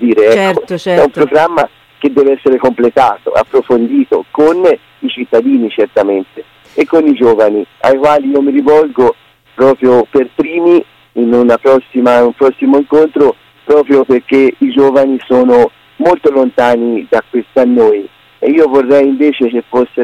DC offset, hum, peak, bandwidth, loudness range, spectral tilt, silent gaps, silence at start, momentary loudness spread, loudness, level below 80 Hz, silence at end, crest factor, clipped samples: under 0.1%; none; 0 dBFS; 11 kHz; 2 LU; -6.5 dB/octave; none; 0 s; 6 LU; -10 LUFS; -50 dBFS; 0 s; 10 dB; under 0.1%